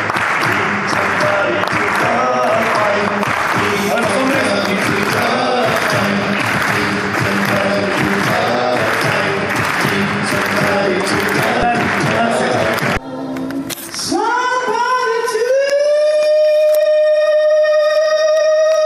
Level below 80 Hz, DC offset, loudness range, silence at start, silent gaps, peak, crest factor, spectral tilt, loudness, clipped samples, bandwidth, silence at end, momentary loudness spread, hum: -46 dBFS; under 0.1%; 3 LU; 0 s; none; 0 dBFS; 14 dB; -4.5 dB/octave; -14 LUFS; under 0.1%; 15.5 kHz; 0 s; 4 LU; none